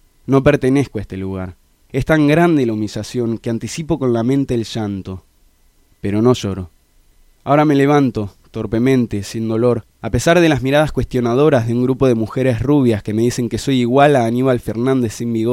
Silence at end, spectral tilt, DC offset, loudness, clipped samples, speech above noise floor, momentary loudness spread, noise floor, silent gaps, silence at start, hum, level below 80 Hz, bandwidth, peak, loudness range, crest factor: 0 s; -6.5 dB/octave; under 0.1%; -16 LUFS; under 0.1%; 38 dB; 13 LU; -54 dBFS; none; 0.3 s; none; -40 dBFS; 15.5 kHz; 0 dBFS; 5 LU; 16 dB